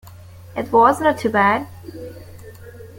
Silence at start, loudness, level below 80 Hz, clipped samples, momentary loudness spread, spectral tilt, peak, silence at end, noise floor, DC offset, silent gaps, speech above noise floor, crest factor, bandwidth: 0.05 s; -17 LUFS; -52 dBFS; under 0.1%; 21 LU; -5.5 dB/octave; -2 dBFS; 0.1 s; -40 dBFS; under 0.1%; none; 22 dB; 18 dB; 17 kHz